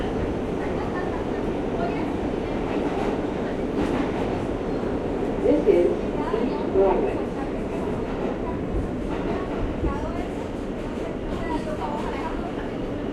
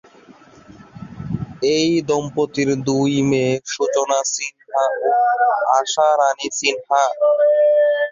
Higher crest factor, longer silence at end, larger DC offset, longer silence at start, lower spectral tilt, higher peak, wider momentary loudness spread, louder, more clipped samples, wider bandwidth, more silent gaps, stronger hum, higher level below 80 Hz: about the same, 18 dB vs 16 dB; about the same, 0 s vs 0 s; neither; second, 0 s vs 0.95 s; first, -7.5 dB/octave vs -4 dB/octave; second, -6 dBFS vs -2 dBFS; about the same, 9 LU vs 9 LU; second, -26 LUFS vs -18 LUFS; neither; first, 12 kHz vs 7.6 kHz; neither; neither; first, -36 dBFS vs -54 dBFS